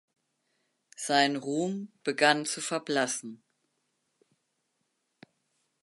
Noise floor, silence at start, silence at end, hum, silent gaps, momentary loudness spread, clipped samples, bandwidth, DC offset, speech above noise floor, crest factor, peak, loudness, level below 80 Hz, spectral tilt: -79 dBFS; 1 s; 2.45 s; none; none; 11 LU; under 0.1%; 12 kHz; under 0.1%; 50 dB; 26 dB; -6 dBFS; -28 LUFS; -86 dBFS; -3 dB/octave